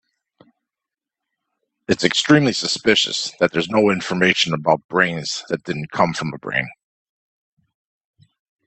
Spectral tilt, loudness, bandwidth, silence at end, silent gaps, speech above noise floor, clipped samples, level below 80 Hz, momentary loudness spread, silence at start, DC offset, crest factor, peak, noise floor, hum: -4 dB/octave; -19 LUFS; 8.8 kHz; 1.95 s; 4.84-4.89 s; 68 dB; under 0.1%; -58 dBFS; 10 LU; 1.9 s; under 0.1%; 22 dB; 0 dBFS; -87 dBFS; none